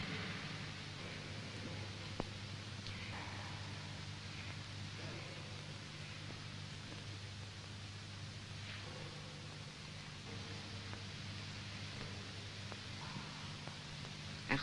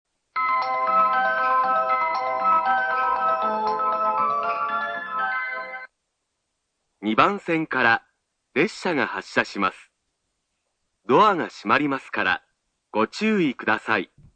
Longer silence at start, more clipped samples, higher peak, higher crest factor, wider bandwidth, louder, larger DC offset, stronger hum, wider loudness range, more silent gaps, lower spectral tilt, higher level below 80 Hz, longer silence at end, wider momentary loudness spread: second, 0 s vs 0.35 s; neither; second, -18 dBFS vs 0 dBFS; first, 30 dB vs 24 dB; first, 11.5 kHz vs 9.2 kHz; second, -47 LUFS vs -22 LUFS; neither; first, 50 Hz at -55 dBFS vs none; second, 2 LU vs 5 LU; neither; about the same, -4 dB/octave vs -5 dB/octave; about the same, -64 dBFS vs -64 dBFS; second, 0 s vs 0.3 s; second, 4 LU vs 7 LU